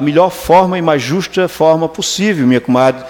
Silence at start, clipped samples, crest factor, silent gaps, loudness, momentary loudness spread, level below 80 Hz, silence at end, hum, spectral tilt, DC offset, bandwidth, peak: 0 s; under 0.1%; 12 dB; none; -12 LUFS; 5 LU; -44 dBFS; 0 s; none; -5 dB/octave; under 0.1%; 18 kHz; 0 dBFS